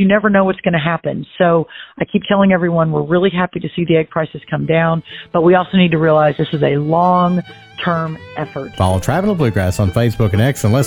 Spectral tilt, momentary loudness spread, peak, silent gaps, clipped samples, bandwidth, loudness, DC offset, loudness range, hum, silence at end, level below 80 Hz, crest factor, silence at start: -7 dB/octave; 10 LU; -2 dBFS; none; under 0.1%; 17.5 kHz; -15 LUFS; under 0.1%; 3 LU; none; 0 s; -42 dBFS; 12 dB; 0 s